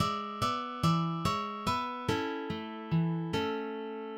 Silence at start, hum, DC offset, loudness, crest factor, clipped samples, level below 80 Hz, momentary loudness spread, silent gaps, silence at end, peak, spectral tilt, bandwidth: 0 s; none; under 0.1%; -33 LUFS; 18 dB; under 0.1%; -56 dBFS; 8 LU; none; 0 s; -16 dBFS; -6 dB/octave; 16.5 kHz